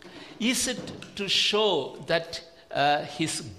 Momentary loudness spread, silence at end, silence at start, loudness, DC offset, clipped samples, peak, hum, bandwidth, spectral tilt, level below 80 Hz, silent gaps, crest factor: 15 LU; 0 s; 0.05 s; -26 LUFS; under 0.1%; under 0.1%; -10 dBFS; none; 16 kHz; -2.5 dB/octave; -60 dBFS; none; 18 dB